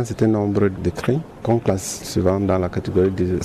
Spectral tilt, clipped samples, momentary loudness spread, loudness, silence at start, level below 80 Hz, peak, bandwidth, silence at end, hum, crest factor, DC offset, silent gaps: -6.5 dB/octave; under 0.1%; 5 LU; -20 LUFS; 0 s; -42 dBFS; -6 dBFS; 14.5 kHz; 0 s; none; 14 dB; under 0.1%; none